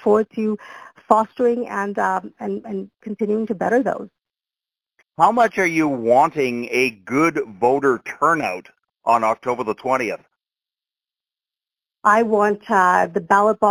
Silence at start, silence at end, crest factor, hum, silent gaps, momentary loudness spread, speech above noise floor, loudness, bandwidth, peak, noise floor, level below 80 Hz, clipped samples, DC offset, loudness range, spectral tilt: 0 s; 0 s; 20 dB; none; none; 11 LU; over 71 dB; -19 LUFS; 19 kHz; 0 dBFS; under -90 dBFS; -64 dBFS; under 0.1%; under 0.1%; 6 LU; -5.5 dB/octave